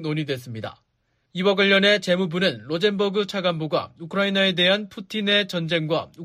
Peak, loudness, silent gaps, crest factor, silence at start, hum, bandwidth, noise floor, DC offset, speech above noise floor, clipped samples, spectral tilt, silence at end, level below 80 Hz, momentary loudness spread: -6 dBFS; -21 LUFS; none; 18 dB; 0 s; none; 15 kHz; -70 dBFS; under 0.1%; 48 dB; under 0.1%; -5 dB/octave; 0 s; -66 dBFS; 13 LU